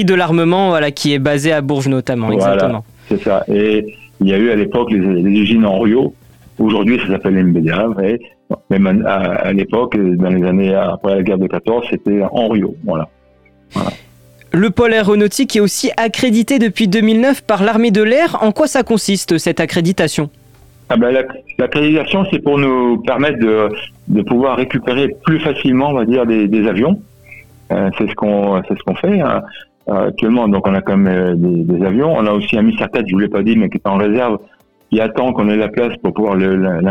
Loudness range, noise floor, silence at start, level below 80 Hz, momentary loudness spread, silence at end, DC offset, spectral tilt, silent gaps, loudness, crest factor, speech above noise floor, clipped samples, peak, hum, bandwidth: 3 LU; -49 dBFS; 0 s; -48 dBFS; 6 LU; 0 s; 0.6%; -6 dB/octave; none; -14 LUFS; 14 dB; 36 dB; under 0.1%; 0 dBFS; none; 15.5 kHz